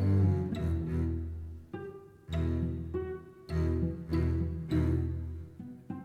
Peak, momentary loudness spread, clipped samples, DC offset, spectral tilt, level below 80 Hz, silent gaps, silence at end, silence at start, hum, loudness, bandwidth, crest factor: -18 dBFS; 14 LU; under 0.1%; under 0.1%; -9.5 dB/octave; -40 dBFS; none; 0 s; 0 s; none; -33 LUFS; 8 kHz; 14 dB